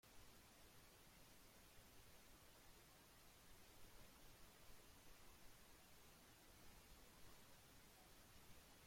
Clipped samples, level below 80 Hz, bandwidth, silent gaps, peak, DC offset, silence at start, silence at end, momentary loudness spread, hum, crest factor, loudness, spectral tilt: under 0.1%; -74 dBFS; 16.5 kHz; none; -50 dBFS; under 0.1%; 0.05 s; 0 s; 1 LU; none; 16 dB; -67 LUFS; -3 dB/octave